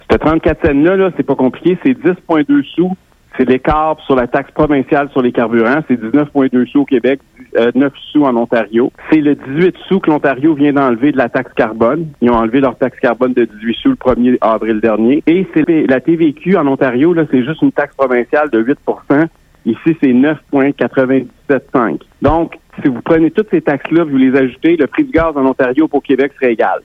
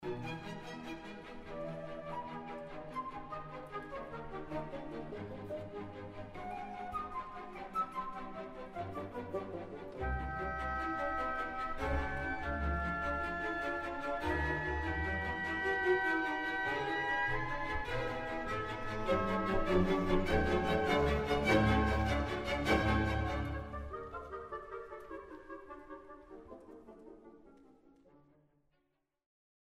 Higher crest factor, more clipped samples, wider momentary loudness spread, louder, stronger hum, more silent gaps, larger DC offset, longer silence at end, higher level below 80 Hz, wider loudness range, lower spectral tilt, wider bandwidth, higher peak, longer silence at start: second, 12 dB vs 20 dB; neither; second, 5 LU vs 16 LU; first, -13 LUFS vs -37 LUFS; neither; neither; neither; second, 0.05 s vs 1.55 s; first, -38 dBFS vs -46 dBFS; second, 2 LU vs 13 LU; first, -9 dB/octave vs -6.5 dB/octave; second, 5.2 kHz vs 15 kHz; first, 0 dBFS vs -16 dBFS; about the same, 0.1 s vs 0 s